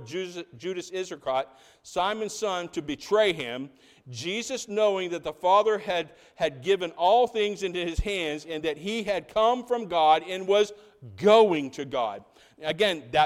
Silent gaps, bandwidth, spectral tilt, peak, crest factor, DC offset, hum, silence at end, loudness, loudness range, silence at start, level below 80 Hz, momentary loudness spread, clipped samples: none; 14.5 kHz; -4 dB/octave; -6 dBFS; 20 dB; under 0.1%; none; 0 s; -26 LUFS; 5 LU; 0 s; -48 dBFS; 13 LU; under 0.1%